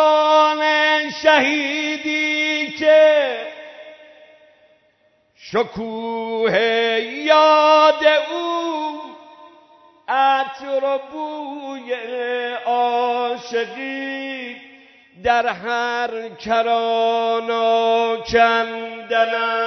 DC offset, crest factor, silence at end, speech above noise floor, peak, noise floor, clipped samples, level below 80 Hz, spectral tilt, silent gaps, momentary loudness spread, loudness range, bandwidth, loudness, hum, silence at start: under 0.1%; 18 dB; 0 s; 42 dB; -2 dBFS; -60 dBFS; under 0.1%; -58 dBFS; -3.5 dB/octave; none; 15 LU; 7 LU; 6.4 kHz; -18 LUFS; none; 0 s